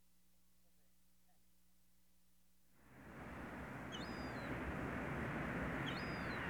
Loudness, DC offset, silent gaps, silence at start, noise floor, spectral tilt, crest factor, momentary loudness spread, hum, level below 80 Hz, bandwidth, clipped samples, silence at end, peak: -46 LUFS; under 0.1%; none; 2.8 s; -77 dBFS; -6 dB/octave; 16 dB; 10 LU; 60 Hz at -70 dBFS; -60 dBFS; over 20 kHz; under 0.1%; 0 s; -32 dBFS